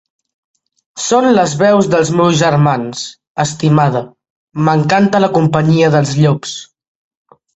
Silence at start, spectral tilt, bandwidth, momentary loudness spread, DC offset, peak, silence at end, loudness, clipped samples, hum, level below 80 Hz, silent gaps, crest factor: 0.95 s; -6 dB/octave; 8.2 kHz; 12 LU; under 0.1%; 0 dBFS; 0.9 s; -12 LUFS; under 0.1%; none; -50 dBFS; 3.27-3.35 s, 4.30-4.47 s; 14 dB